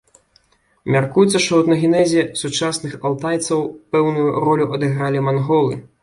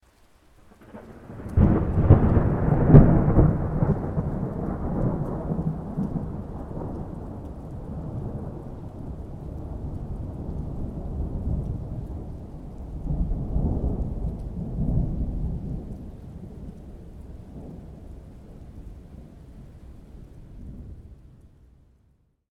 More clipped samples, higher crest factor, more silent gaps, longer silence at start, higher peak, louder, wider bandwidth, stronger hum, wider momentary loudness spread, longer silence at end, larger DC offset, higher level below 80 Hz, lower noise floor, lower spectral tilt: neither; second, 16 dB vs 26 dB; neither; about the same, 0.85 s vs 0.8 s; about the same, -2 dBFS vs 0 dBFS; first, -18 LUFS vs -25 LUFS; first, 11.5 kHz vs 3.3 kHz; neither; second, 7 LU vs 24 LU; second, 0.2 s vs 1.05 s; neither; second, -56 dBFS vs -32 dBFS; second, -58 dBFS vs -64 dBFS; second, -5.5 dB/octave vs -11.5 dB/octave